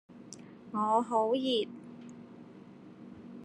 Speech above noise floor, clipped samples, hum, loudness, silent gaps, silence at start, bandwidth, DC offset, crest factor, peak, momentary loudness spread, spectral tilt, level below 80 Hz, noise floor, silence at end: 22 dB; under 0.1%; none; -31 LUFS; none; 0.1 s; 11.5 kHz; under 0.1%; 20 dB; -16 dBFS; 23 LU; -5 dB/octave; -80 dBFS; -52 dBFS; 0 s